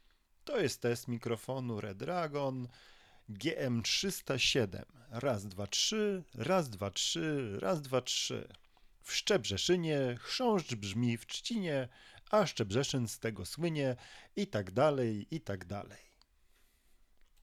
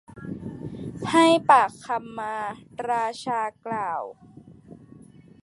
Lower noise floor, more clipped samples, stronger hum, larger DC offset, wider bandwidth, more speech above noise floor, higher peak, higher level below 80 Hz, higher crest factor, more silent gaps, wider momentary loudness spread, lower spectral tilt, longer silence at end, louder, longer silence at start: first, -68 dBFS vs -49 dBFS; neither; neither; neither; first, 15.5 kHz vs 11.5 kHz; first, 33 dB vs 26 dB; second, -18 dBFS vs -4 dBFS; about the same, -64 dBFS vs -60 dBFS; about the same, 18 dB vs 22 dB; neither; second, 11 LU vs 18 LU; about the same, -4 dB/octave vs -4.5 dB/octave; first, 1.45 s vs 0.45 s; second, -35 LUFS vs -24 LUFS; first, 0.45 s vs 0.1 s